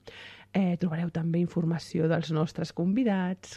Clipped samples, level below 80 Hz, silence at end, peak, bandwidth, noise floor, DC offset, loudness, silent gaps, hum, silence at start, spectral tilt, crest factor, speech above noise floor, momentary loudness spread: under 0.1%; -62 dBFS; 0 s; -16 dBFS; 9.2 kHz; -48 dBFS; under 0.1%; -29 LUFS; none; none; 0.05 s; -7.5 dB/octave; 12 dB; 20 dB; 5 LU